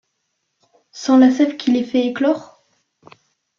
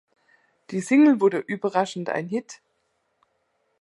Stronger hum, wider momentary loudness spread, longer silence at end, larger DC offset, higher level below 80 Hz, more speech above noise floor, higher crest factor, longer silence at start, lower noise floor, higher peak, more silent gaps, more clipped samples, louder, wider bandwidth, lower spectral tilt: neither; second, 9 LU vs 14 LU; about the same, 1.15 s vs 1.25 s; neither; first, -66 dBFS vs -78 dBFS; first, 57 dB vs 50 dB; about the same, 16 dB vs 18 dB; first, 0.95 s vs 0.7 s; about the same, -72 dBFS vs -72 dBFS; first, -2 dBFS vs -6 dBFS; neither; neither; first, -17 LUFS vs -23 LUFS; second, 7.2 kHz vs 11.5 kHz; second, -4.5 dB/octave vs -6 dB/octave